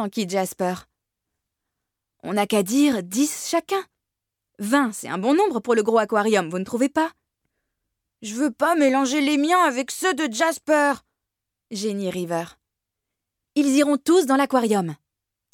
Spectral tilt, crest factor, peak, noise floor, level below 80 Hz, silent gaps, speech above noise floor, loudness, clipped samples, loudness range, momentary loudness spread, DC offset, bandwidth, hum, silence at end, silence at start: -4 dB/octave; 16 dB; -8 dBFS; -84 dBFS; -70 dBFS; none; 63 dB; -22 LUFS; under 0.1%; 4 LU; 9 LU; under 0.1%; 18.5 kHz; none; 0.6 s; 0 s